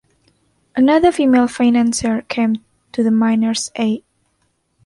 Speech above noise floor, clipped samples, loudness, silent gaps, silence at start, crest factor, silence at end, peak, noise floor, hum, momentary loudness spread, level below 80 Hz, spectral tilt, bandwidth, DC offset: 50 dB; under 0.1%; -16 LUFS; none; 0.75 s; 16 dB; 0.85 s; -2 dBFS; -65 dBFS; none; 10 LU; -50 dBFS; -4.5 dB/octave; 11.5 kHz; under 0.1%